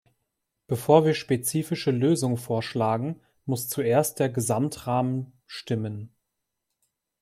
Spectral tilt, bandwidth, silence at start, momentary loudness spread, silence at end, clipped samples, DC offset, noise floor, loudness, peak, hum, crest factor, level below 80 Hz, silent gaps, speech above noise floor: -5.5 dB/octave; 16 kHz; 0.7 s; 13 LU; 1.15 s; under 0.1%; under 0.1%; -81 dBFS; -25 LUFS; -4 dBFS; none; 22 dB; -66 dBFS; none; 57 dB